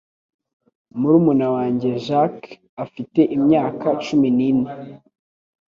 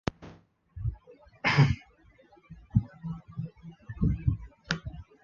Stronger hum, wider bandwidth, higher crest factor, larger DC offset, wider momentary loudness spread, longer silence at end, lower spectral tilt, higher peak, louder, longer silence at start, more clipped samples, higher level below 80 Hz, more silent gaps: neither; about the same, 7.4 kHz vs 7.2 kHz; second, 16 dB vs 22 dB; neither; second, 18 LU vs 26 LU; first, 0.7 s vs 0.2 s; first, -8.5 dB/octave vs -6.5 dB/octave; first, -4 dBFS vs -10 dBFS; first, -18 LUFS vs -31 LUFS; first, 0.95 s vs 0.2 s; neither; second, -60 dBFS vs -42 dBFS; first, 2.69-2.77 s vs none